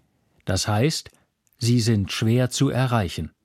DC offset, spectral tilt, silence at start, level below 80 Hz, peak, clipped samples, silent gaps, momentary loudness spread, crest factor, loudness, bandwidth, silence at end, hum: under 0.1%; -5.5 dB/octave; 0.45 s; -48 dBFS; -6 dBFS; under 0.1%; none; 8 LU; 16 dB; -23 LUFS; 15 kHz; 0.15 s; none